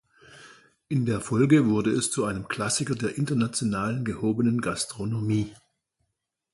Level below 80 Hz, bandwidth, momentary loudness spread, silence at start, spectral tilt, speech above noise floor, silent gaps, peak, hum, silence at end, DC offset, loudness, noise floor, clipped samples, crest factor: -56 dBFS; 11.5 kHz; 9 LU; 0.3 s; -5.5 dB/octave; 55 dB; none; -8 dBFS; none; 1 s; under 0.1%; -26 LUFS; -80 dBFS; under 0.1%; 20 dB